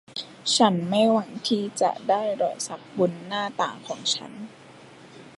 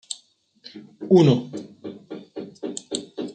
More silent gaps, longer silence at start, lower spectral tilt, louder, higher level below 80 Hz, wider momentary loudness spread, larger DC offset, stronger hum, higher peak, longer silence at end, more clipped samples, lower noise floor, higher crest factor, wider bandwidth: neither; about the same, 0.1 s vs 0.1 s; second, -4 dB/octave vs -6.5 dB/octave; second, -25 LUFS vs -21 LUFS; second, -74 dBFS vs -68 dBFS; second, 12 LU vs 24 LU; neither; neither; about the same, -4 dBFS vs -4 dBFS; about the same, 0.1 s vs 0 s; neither; second, -48 dBFS vs -57 dBFS; about the same, 22 dB vs 20 dB; first, 11.5 kHz vs 9.4 kHz